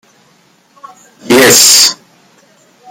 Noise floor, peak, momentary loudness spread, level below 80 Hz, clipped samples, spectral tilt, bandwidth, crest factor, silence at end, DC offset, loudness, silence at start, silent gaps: -49 dBFS; 0 dBFS; 10 LU; -52 dBFS; 0.8%; -1 dB/octave; over 20 kHz; 12 dB; 0.95 s; under 0.1%; -4 LUFS; 1.25 s; none